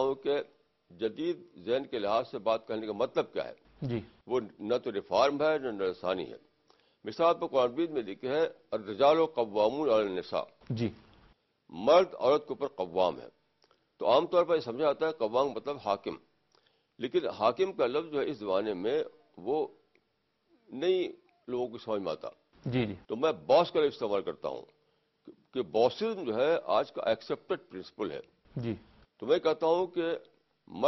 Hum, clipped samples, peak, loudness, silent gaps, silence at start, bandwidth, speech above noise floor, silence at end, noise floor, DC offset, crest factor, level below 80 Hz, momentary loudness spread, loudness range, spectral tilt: none; under 0.1%; -12 dBFS; -31 LUFS; none; 0 s; 6.2 kHz; 47 dB; 0 s; -77 dBFS; under 0.1%; 20 dB; -68 dBFS; 13 LU; 4 LU; -6.5 dB/octave